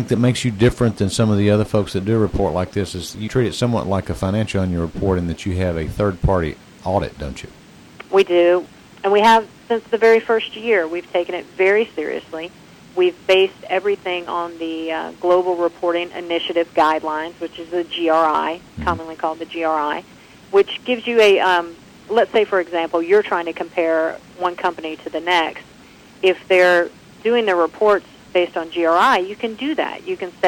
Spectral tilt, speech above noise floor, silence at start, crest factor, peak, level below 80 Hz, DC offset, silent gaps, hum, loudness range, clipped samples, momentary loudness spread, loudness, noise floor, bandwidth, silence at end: -6 dB/octave; 26 dB; 0 s; 14 dB; -4 dBFS; -40 dBFS; under 0.1%; none; none; 4 LU; under 0.1%; 11 LU; -19 LUFS; -45 dBFS; 16.5 kHz; 0 s